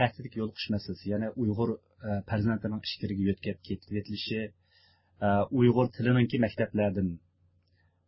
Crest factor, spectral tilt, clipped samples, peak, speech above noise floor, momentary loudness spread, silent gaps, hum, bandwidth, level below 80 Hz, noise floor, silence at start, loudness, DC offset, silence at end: 20 dB; -11 dB/octave; under 0.1%; -10 dBFS; 39 dB; 11 LU; none; none; 5.8 kHz; -54 dBFS; -69 dBFS; 0 s; -30 LUFS; under 0.1%; 0.9 s